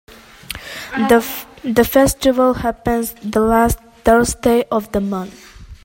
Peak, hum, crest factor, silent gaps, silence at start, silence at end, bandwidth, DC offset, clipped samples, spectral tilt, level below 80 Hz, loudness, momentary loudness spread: 0 dBFS; none; 16 dB; none; 0.5 s; 0.1 s; 16.5 kHz; under 0.1%; under 0.1%; -4.5 dB/octave; -34 dBFS; -16 LUFS; 13 LU